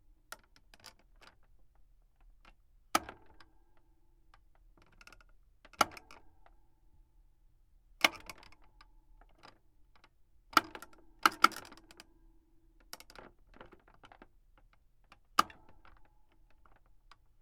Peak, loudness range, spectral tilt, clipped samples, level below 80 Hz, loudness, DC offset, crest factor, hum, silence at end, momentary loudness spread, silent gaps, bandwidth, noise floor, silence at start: -6 dBFS; 10 LU; -1 dB/octave; under 0.1%; -66 dBFS; -32 LUFS; under 0.1%; 36 dB; none; 2 s; 27 LU; none; 16.5 kHz; -65 dBFS; 2.95 s